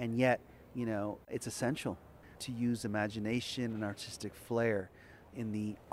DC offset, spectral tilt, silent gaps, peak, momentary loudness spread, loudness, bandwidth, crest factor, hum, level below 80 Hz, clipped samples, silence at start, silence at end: under 0.1%; -5.5 dB/octave; none; -16 dBFS; 14 LU; -37 LUFS; 15.5 kHz; 22 dB; none; -64 dBFS; under 0.1%; 0 s; 0 s